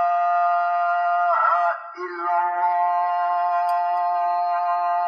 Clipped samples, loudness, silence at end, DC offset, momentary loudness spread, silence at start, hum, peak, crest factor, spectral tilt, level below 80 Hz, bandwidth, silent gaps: under 0.1%; -21 LUFS; 0 s; under 0.1%; 4 LU; 0 s; none; -8 dBFS; 12 dB; -1.5 dB/octave; -88 dBFS; 6.2 kHz; none